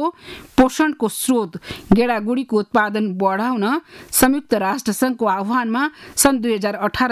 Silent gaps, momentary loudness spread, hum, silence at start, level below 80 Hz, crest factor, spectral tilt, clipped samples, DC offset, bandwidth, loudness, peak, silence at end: none; 6 LU; none; 0 s; -46 dBFS; 16 dB; -4 dB/octave; under 0.1%; under 0.1%; 16 kHz; -19 LUFS; -4 dBFS; 0 s